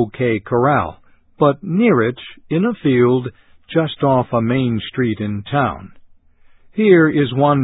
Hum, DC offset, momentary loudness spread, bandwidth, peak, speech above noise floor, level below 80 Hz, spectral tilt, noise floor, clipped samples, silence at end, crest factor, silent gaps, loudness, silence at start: none; under 0.1%; 9 LU; 4 kHz; 0 dBFS; 32 dB; -48 dBFS; -12.5 dB/octave; -48 dBFS; under 0.1%; 0 s; 16 dB; none; -17 LUFS; 0 s